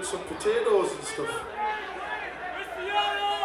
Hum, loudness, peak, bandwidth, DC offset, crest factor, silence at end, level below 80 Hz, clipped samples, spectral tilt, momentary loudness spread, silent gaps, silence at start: none; -29 LUFS; -12 dBFS; 14 kHz; under 0.1%; 16 dB; 0 s; -58 dBFS; under 0.1%; -2.5 dB/octave; 9 LU; none; 0 s